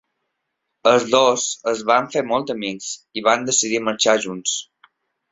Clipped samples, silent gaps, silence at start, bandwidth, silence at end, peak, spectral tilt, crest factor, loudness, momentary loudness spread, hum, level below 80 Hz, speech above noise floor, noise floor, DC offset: under 0.1%; none; 0.85 s; 8 kHz; 0.7 s; -2 dBFS; -2 dB/octave; 18 dB; -19 LUFS; 10 LU; none; -64 dBFS; 58 dB; -77 dBFS; under 0.1%